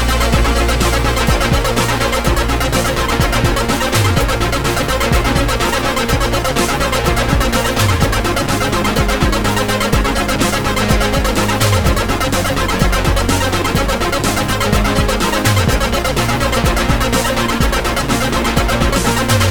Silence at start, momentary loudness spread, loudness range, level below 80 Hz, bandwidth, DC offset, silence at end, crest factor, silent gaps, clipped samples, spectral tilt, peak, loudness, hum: 0 s; 2 LU; 0 LU; -20 dBFS; over 20 kHz; under 0.1%; 0 s; 14 dB; none; under 0.1%; -4.5 dB/octave; 0 dBFS; -15 LUFS; none